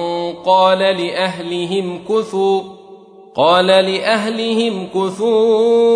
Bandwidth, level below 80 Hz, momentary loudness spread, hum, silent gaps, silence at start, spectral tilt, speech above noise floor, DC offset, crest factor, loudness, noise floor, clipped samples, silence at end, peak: 10.5 kHz; -64 dBFS; 9 LU; none; none; 0 s; -5 dB/octave; 26 dB; under 0.1%; 14 dB; -15 LUFS; -40 dBFS; under 0.1%; 0 s; 0 dBFS